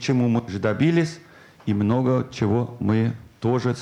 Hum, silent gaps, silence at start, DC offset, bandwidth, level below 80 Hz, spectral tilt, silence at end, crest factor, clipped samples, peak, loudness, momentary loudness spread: none; none; 0 s; under 0.1%; 10 kHz; -56 dBFS; -7.5 dB/octave; 0 s; 14 dB; under 0.1%; -8 dBFS; -23 LUFS; 8 LU